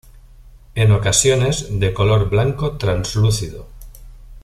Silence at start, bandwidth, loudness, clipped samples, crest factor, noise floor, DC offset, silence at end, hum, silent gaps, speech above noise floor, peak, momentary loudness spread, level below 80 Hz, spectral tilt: 0.15 s; 13 kHz; -17 LUFS; under 0.1%; 16 dB; -43 dBFS; under 0.1%; 0.05 s; none; none; 26 dB; -2 dBFS; 10 LU; -34 dBFS; -4.5 dB/octave